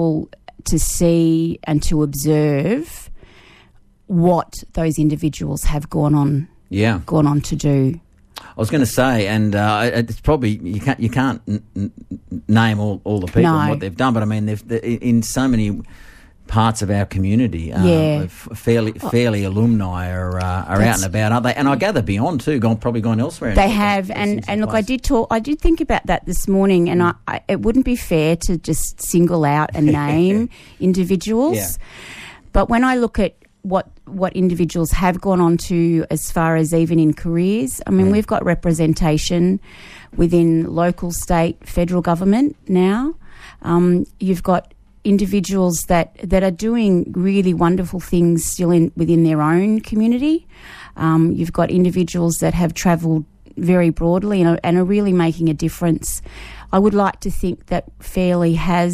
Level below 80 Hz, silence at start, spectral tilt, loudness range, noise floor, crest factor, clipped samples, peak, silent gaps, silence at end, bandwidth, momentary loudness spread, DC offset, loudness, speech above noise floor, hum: -32 dBFS; 0 s; -6.5 dB/octave; 3 LU; -50 dBFS; 16 dB; under 0.1%; 0 dBFS; none; 0 s; 15.5 kHz; 8 LU; under 0.1%; -18 LUFS; 33 dB; none